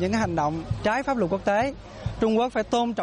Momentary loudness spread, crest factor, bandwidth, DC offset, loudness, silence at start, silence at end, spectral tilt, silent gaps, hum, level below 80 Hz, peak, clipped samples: 5 LU; 14 dB; 10.5 kHz; under 0.1%; -25 LUFS; 0 s; 0 s; -6 dB/octave; none; none; -44 dBFS; -10 dBFS; under 0.1%